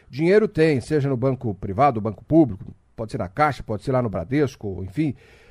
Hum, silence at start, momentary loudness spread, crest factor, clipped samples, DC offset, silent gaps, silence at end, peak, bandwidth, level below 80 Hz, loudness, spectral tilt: none; 0.1 s; 13 LU; 18 dB; under 0.1%; under 0.1%; none; 0.35 s; -4 dBFS; 11.5 kHz; -48 dBFS; -22 LUFS; -8 dB/octave